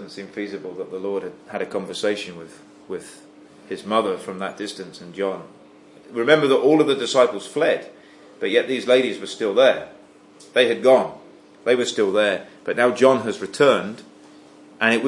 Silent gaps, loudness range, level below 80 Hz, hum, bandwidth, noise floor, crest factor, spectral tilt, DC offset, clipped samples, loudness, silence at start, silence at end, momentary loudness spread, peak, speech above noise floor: none; 9 LU; -74 dBFS; none; 11.5 kHz; -47 dBFS; 20 dB; -4 dB/octave; under 0.1%; under 0.1%; -21 LUFS; 0 s; 0 s; 18 LU; -2 dBFS; 27 dB